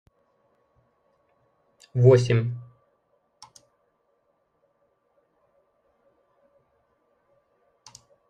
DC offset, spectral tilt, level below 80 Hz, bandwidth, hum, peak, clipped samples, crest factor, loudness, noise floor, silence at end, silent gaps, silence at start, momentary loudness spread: under 0.1%; -7.5 dB/octave; -64 dBFS; 9 kHz; none; -6 dBFS; under 0.1%; 24 dB; -21 LUFS; -71 dBFS; 5.7 s; none; 1.95 s; 16 LU